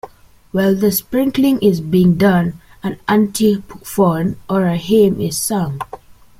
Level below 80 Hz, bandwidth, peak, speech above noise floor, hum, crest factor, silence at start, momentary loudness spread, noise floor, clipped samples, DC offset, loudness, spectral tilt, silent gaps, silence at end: -46 dBFS; 16 kHz; -2 dBFS; 26 dB; none; 14 dB; 0.05 s; 11 LU; -41 dBFS; under 0.1%; under 0.1%; -16 LUFS; -6 dB/octave; none; 0.45 s